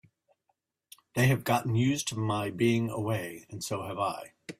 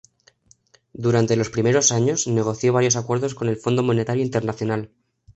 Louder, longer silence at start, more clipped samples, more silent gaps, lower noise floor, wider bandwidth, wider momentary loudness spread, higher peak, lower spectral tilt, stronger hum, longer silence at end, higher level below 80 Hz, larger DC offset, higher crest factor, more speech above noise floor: second, -30 LUFS vs -21 LUFS; first, 1.15 s vs 1 s; neither; neither; first, -78 dBFS vs -57 dBFS; first, 16 kHz vs 8.2 kHz; about the same, 10 LU vs 9 LU; second, -12 dBFS vs -4 dBFS; about the same, -5.5 dB/octave vs -5 dB/octave; neither; about the same, 0.05 s vs 0.05 s; second, -64 dBFS vs -56 dBFS; neither; about the same, 18 dB vs 18 dB; first, 49 dB vs 37 dB